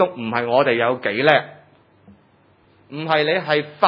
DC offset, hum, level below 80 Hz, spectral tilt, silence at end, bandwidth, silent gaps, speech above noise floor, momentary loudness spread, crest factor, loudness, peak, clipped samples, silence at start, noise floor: under 0.1%; none; -72 dBFS; -7.5 dB/octave; 0 s; 6 kHz; none; 37 dB; 12 LU; 20 dB; -19 LUFS; 0 dBFS; under 0.1%; 0 s; -56 dBFS